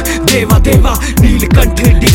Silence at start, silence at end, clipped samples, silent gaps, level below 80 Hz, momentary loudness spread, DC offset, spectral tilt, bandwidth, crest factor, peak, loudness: 0 s; 0 s; 0.2%; none; -12 dBFS; 2 LU; under 0.1%; -5 dB/octave; 17.5 kHz; 8 dB; 0 dBFS; -9 LUFS